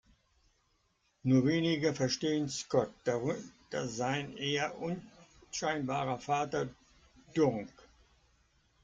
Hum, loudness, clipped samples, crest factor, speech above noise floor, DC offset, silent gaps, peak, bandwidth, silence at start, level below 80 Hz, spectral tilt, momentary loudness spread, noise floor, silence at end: none; -34 LUFS; under 0.1%; 20 dB; 42 dB; under 0.1%; none; -14 dBFS; 9.2 kHz; 1.25 s; -68 dBFS; -5 dB/octave; 11 LU; -75 dBFS; 1.15 s